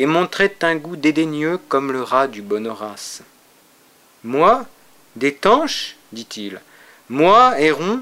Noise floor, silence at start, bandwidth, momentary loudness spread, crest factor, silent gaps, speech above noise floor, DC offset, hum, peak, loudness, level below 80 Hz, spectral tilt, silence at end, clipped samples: -52 dBFS; 0 s; 16 kHz; 19 LU; 18 dB; none; 35 dB; under 0.1%; none; 0 dBFS; -17 LUFS; -58 dBFS; -4.5 dB/octave; 0 s; under 0.1%